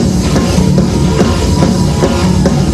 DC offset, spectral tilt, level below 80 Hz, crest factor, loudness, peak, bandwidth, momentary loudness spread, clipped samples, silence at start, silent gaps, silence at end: under 0.1%; -6 dB/octave; -20 dBFS; 10 dB; -11 LUFS; 0 dBFS; 14 kHz; 1 LU; under 0.1%; 0 s; none; 0 s